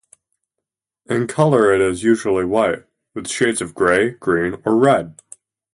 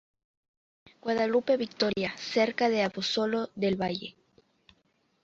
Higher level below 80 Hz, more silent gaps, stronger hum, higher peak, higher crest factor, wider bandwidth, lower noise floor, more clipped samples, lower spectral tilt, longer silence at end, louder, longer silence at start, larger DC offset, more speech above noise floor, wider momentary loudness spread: first, -50 dBFS vs -68 dBFS; neither; neither; first, -2 dBFS vs -12 dBFS; about the same, 16 dB vs 20 dB; first, 11.5 kHz vs 7.8 kHz; first, -83 dBFS vs -71 dBFS; neither; about the same, -5.5 dB/octave vs -5 dB/octave; second, 0.65 s vs 1.15 s; first, -17 LUFS vs -29 LUFS; about the same, 1.1 s vs 1.05 s; neither; first, 66 dB vs 43 dB; first, 11 LU vs 7 LU